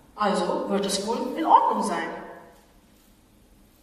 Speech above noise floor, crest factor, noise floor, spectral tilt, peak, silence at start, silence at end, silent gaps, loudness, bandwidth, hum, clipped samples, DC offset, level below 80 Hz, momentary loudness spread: 33 dB; 22 dB; -57 dBFS; -4 dB/octave; -4 dBFS; 0.15 s; 1.35 s; none; -24 LUFS; 15 kHz; none; under 0.1%; under 0.1%; -60 dBFS; 14 LU